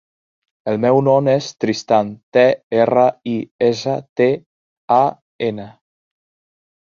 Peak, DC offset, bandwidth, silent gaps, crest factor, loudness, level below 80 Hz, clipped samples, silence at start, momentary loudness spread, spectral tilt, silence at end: -2 dBFS; under 0.1%; 7.4 kHz; 2.23-2.32 s, 2.63-2.70 s, 3.51-3.59 s, 4.09-4.16 s, 4.46-4.88 s, 5.21-5.39 s; 16 dB; -17 LUFS; -60 dBFS; under 0.1%; 0.65 s; 10 LU; -6.5 dB/octave; 1.25 s